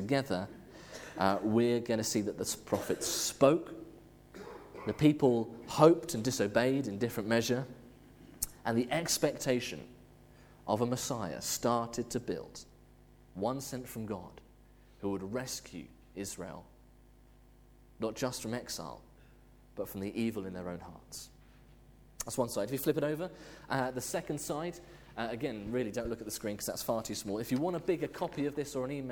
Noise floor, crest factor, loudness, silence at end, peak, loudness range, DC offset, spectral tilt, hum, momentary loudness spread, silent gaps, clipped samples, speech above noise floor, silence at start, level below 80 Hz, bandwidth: -60 dBFS; 26 dB; -34 LUFS; 0 s; -8 dBFS; 12 LU; under 0.1%; -4.5 dB/octave; none; 19 LU; none; under 0.1%; 26 dB; 0 s; -60 dBFS; over 20 kHz